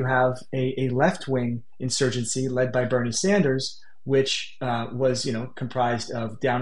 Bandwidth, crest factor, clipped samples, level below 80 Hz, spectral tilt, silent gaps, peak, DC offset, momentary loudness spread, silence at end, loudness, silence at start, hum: 11.5 kHz; 16 dB; under 0.1%; -60 dBFS; -4.5 dB/octave; none; -8 dBFS; 1%; 8 LU; 0 s; -25 LUFS; 0 s; none